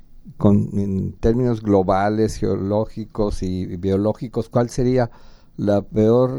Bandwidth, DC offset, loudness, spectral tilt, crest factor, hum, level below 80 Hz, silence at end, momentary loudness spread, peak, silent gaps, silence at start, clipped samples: 12 kHz; under 0.1%; -20 LUFS; -8 dB/octave; 16 dB; none; -36 dBFS; 0 s; 8 LU; -2 dBFS; none; 0.15 s; under 0.1%